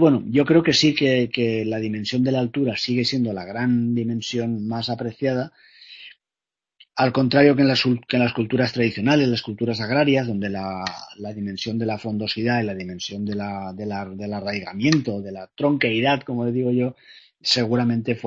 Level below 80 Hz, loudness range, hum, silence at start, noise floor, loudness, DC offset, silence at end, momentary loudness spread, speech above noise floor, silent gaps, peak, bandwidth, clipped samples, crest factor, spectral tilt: -58 dBFS; 7 LU; none; 0 s; -90 dBFS; -22 LUFS; under 0.1%; 0 s; 12 LU; 68 dB; none; 0 dBFS; 7.8 kHz; under 0.1%; 22 dB; -6 dB/octave